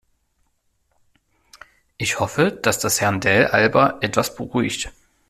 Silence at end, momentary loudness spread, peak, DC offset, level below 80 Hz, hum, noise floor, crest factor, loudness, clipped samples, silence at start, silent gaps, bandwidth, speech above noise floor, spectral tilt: 0.4 s; 9 LU; -2 dBFS; under 0.1%; -50 dBFS; none; -67 dBFS; 20 dB; -19 LUFS; under 0.1%; 2 s; none; 15.5 kHz; 48 dB; -4 dB/octave